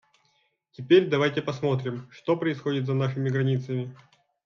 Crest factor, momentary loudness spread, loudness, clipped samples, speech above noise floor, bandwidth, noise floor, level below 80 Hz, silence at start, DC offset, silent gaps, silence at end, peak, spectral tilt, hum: 20 dB; 13 LU; -26 LUFS; under 0.1%; 45 dB; 6.8 kHz; -70 dBFS; -70 dBFS; 0.8 s; under 0.1%; none; 0.5 s; -8 dBFS; -7.5 dB/octave; none